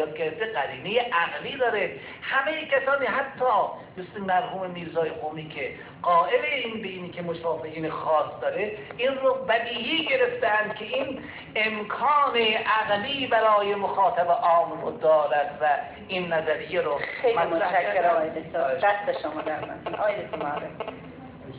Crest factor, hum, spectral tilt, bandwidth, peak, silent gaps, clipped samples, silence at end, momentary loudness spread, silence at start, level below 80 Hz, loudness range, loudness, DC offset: 16 dB; none; -7.5 dB/octave; 4 kHz; -10 dBFS; none; under 0.1%; 0 s; 11 LU; 0 s; -62 dBFS; 5 LU; -25 LUFS; under 0.1%